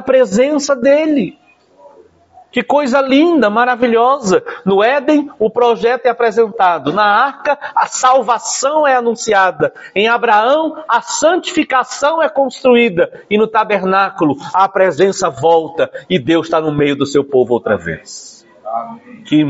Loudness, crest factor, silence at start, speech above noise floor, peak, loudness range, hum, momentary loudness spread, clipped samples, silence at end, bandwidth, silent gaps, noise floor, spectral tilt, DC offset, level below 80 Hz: -13 LUFS; 12 dB; 0 s; 33 dB; 0 dBFS; 2 LU; none; 7 LU; under 0.1%; 0 s; 8 kHz; none; -45 dBFS; -4.5 dB/octave; under 0.1%; -56 dBFS